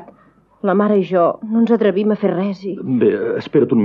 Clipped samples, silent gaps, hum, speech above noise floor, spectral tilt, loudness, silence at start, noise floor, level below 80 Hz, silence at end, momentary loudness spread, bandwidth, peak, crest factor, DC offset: under 0.1%; none; none; 36 dB; -9.5 dB/octave; -17 LUFS; 0 s; -52 dBFS; -64 dBFS; 0 s; 7 LU; 5.8 kHz; -2 dBFS; 14 dB; under 0.1%